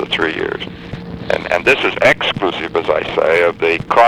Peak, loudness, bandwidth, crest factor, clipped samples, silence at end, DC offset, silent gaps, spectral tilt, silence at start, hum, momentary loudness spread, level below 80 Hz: 0 dBFS; -15 LUFS; 15.5 kHz; 14 dB; under 0.1%; 0 s; 0.2%; none; -4.5 dB/octave; 0 s; none; 14 LU; -42 dBFS